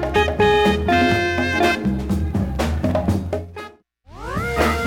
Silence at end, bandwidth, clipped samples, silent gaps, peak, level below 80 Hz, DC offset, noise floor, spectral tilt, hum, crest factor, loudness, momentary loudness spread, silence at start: 0 s; 17 kHz; under 0.1%; none; -6 dBFS; -30 dBFS; under 0.1%; -45 dBFS; -6 dB/octave; none; 14 dB; -19 LUFS; 12 LU; 0 s